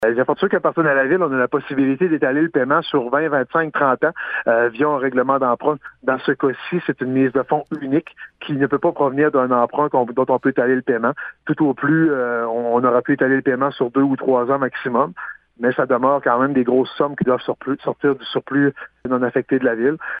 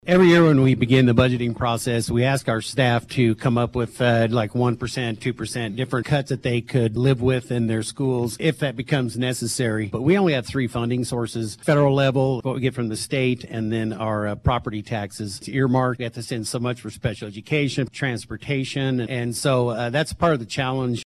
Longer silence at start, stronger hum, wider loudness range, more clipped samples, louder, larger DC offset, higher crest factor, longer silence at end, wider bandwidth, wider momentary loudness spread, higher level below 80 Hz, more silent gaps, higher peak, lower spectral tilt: about the same, 0 s vs 0.05 s; neither; second, 2 LU vs 5 LU; neither; first, -19 LUFS vs -22 LUFS; neither; about the same, 16 dB vs 16 dB; about the same, 0 s vs 0.1 s; second, 4.9 kHz vs 13.5 kHz; second, 6 LU vs 10 LU; second, -62 dBFS vs -46 dBFS; neither; about the same, -2 dBFS vs -4 dBFS; first, -9.5 dB/octave vs -6 dB/octave